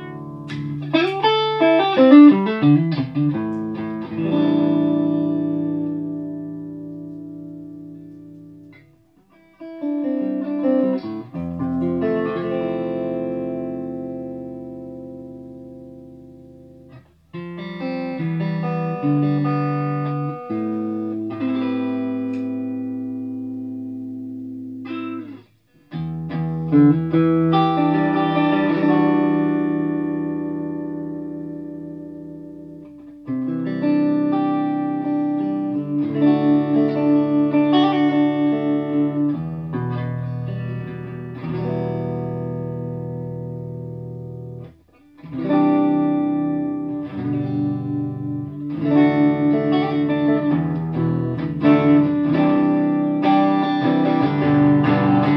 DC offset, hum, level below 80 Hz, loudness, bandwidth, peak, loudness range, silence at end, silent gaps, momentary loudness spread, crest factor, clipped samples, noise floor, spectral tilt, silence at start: under 0.1%; none; -56 dBFS; -20 LUFS; 5.4 kHz; 0 dBFS; 13 LU; 0 s; none; 17 LU; 20 dB; under 0.1%; -55 dBFS; -9.5 dB/octave; 0 s